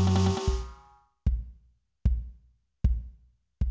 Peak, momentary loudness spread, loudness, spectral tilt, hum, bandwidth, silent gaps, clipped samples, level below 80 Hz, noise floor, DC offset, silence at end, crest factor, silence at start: -14 dBFS; 20 LU; -31 LUFS; -7 dB/octave; none; 8 kHz; none; under 0.1%; -32 dBFS; -62 dBFS; under 0.1%; 0 s; 16 dB; 0 s